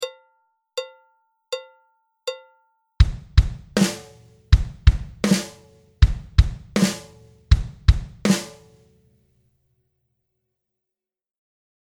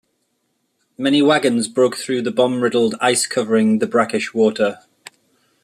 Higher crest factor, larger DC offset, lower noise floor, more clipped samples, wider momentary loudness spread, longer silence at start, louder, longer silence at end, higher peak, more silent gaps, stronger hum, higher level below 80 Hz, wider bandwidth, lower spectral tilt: first, 22 dB vs 16 dB; neither; first, -87 dBFS vs -69 dBFS; neither; first, 14 LU vs 7 LU; second, 0 s vs 1 s; second, -23 LUFS vs -17 LUFS; first, 3.35 s vs 0.9 s; about the same, 0 dBFS vs -2 dBFS; neither; neither; first, -24 dBFS vs -64 dBFS; first, 15.5 kHz vs 14 kHz; first, -5.5 dB/octave vs -4 dB/octave